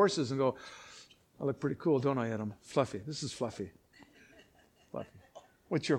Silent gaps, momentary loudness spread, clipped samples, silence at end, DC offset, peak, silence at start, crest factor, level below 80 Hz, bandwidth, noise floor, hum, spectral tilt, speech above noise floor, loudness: none; 19 LU; under 0.1%; 0 s; under 0.1%; -14 dBFS; 0 s; 20 dB; -70 dBFS; 12 kHz; -65 dBFS; none; -5.5 dB/octave; 32 dB; -35 LUFS